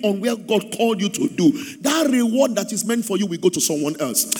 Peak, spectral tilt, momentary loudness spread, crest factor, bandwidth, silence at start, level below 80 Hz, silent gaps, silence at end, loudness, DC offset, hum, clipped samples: -4 dBFS; -4 dB/octave; 5 LU; 16 dB; over 20 kHz; 0 s; -70 dBFS; none; 0 s; -20 LUFS; under 0.1%; none; under 0.1%